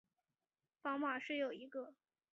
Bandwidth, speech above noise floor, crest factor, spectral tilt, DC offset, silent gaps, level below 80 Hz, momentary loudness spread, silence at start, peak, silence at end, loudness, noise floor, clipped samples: 7.4 kHz; over 47 dB; 18 dB; -0.5 dB/octave; under 0.1%; none; under -90 dBFS; 10 LU; 0.85 s; -28 dBFS; 0.4 s; -43 LUFS; under -90 dBFS; under 0.1%